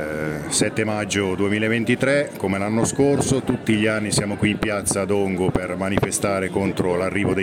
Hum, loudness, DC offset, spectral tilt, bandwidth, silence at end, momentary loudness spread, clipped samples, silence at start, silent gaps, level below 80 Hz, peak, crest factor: none; -21 LUFS; under 0.1%; -4.5 dB/octave; 17 kHz; 0 s; 4 LU; under 0.1%; 0 s; none; -46 dBFS; -4 dBFS; 16 dB